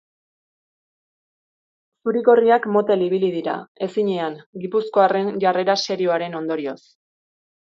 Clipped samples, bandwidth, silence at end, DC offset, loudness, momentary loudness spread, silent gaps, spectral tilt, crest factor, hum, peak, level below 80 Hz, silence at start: under 0.1%; 7.6 kHz; 1 s; under 0.1%; -20 LUFS; 12 LU; 3.68-3.75 s, 4.46-4.53 s; -5.5 dB/octave; 18 dB; none; -4 dBFS; -74 dBFS; 2.05 s